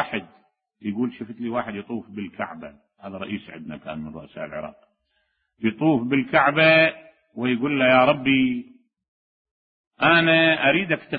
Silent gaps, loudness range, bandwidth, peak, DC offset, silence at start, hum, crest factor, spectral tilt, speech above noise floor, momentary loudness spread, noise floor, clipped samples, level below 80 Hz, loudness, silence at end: 9.08-9.45 s, 9.51-9.91 s; 15 LU; 4.9 kHz; -4 dBFS; under 0.1%; 0 s; none; 18 dB; -10 dB/octave; 50 dB; 20 LU; -72 dBFS; under 0.1%; -60 dBFS; -20 LUFS; 0 s